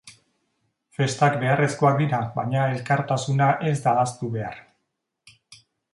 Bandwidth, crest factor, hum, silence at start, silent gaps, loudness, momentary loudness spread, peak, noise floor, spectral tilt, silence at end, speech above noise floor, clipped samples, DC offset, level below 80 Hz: 11.5 kHz; 18 dB; none; 0.05 s; none; -23 LUFS; 10 LU; -6 dBFS; -78 dBFS; -6 dB/octave; 0.4 s; 56 dB; under 0.1%; under 0.1%; -62 dBFS